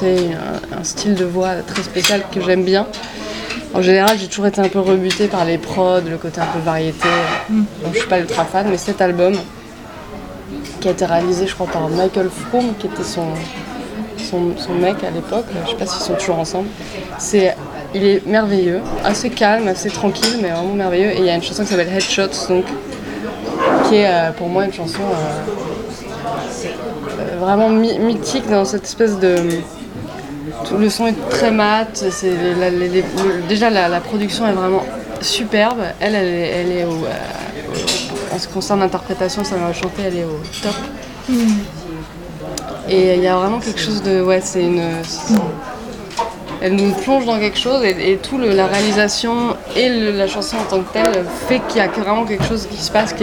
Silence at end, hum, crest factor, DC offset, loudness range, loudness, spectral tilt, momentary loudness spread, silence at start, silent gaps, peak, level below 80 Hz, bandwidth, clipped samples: 0 s; none; 16 dB; under 0.1%; 4 LU; -17 LUFS; -4.5 dB/octave; 12 LU; 0 s; none; 0 dBFS; -42 dBFS; 19 kHz; under 0.1%